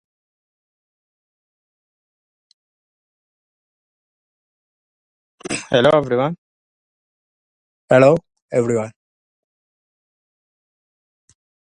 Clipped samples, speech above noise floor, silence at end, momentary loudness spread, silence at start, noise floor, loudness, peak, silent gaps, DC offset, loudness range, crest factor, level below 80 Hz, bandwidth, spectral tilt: under 0.1%; over 75 dB; 2.9 s; 17 LU; 5.5 s; under -90 dBFS; -17 LUFS; 0 dBFS; 6.38-7.88 s, 8.42-8.49 s; under 0.1%; 9 LU; 24 dB; -60 dBFS; 11 kHz; -5.5 dB/octave